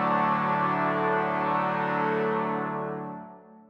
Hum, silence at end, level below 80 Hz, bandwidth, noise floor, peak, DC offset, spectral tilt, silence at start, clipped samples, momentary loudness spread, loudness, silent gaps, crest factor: none; 0.1 s; -68 dBFS; 7.8 kHz; -47 dBFS; -14 dBFS; under 0.1%; -8 dB/octave; 0 s; under 0.1%; 11 LU; -27 LUFS; none; 14 dB